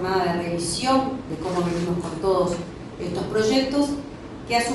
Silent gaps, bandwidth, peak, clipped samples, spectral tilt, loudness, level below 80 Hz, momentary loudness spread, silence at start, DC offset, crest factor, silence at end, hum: none; 11.5 kHz; -8 dBFS; under 0.1%; -5 dB/octave; -24 LUFS; -46 dBFS; 11 LU; 0 s; under 0.1%; 16 dB; 0 s; none